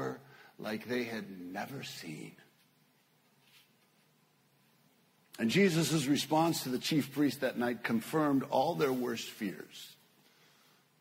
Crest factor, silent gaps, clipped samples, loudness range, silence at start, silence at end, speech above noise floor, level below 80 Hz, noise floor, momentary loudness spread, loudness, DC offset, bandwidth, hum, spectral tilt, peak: 18 dB; none; under 0.1%; 16 LU; 0 s; 1.05 s; 37 dB; -76 dBFS; -70 dBFS; 18 LU; -33 LUFS; under 0.1%; 16 kHz; none; -5 dB/octave; -16 dBFS